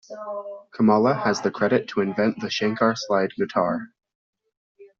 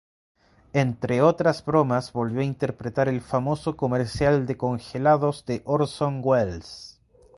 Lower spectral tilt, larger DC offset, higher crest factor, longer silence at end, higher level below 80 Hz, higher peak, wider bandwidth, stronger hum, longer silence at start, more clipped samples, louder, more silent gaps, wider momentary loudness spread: second, -4.5 dB/octave vs -7.5 dB/octave; neither; about the same, 18 dB vs 20 dB; second, 0.15 s vs 0.45 s; second, -64 dBFS vs -50 dBFS; about the same, -6 dBFS vs -4 dBFS; second, 7.4 kHz vs 11.5 kHz; neither; second, 0.1 s vs 0.75 s; neither; about the same, -23 LUFS vs -24 LUFS; first, 4.15-4.33 s, 4.57-4.75 s vs none; first, 14 LU vs 8 LU